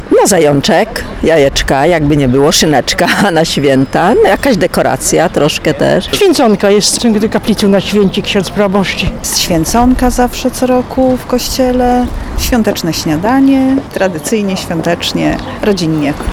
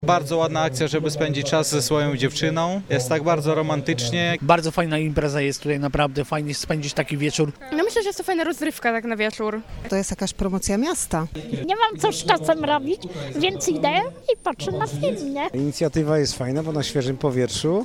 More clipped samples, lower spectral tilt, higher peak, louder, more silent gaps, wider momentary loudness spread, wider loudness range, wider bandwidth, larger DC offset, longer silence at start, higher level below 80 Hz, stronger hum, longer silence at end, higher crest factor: neither; about the same, -4.5 dB/octave vs -4.5 dB/octave; about the same, 0 dBFS vs 0 dBFS; first, -10 LUFS vs -23 LUFS; neither; about the same, 6 LU vs 5 LU; about the same, 3 LU vs 3 LU; first, over 20 kHz vs 17 kHz; neither; about the same, 0 s vs 0 s; first, -26 dBFS vs -44 dBFS; neither; about the same, 0 s vs 0 s; second, 10 dB vs 22 dB